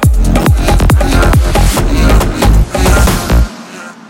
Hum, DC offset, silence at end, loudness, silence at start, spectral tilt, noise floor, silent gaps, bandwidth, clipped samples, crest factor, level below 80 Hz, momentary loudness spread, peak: none; under 0.1%; 0.15 s; -10 LUFS; 0 s; -5.5 dB/octave; -28 dBFS; none; 17 kHz; under 0.1%; 8 dB; -10 dBFS; 4 LU; 0 dBFS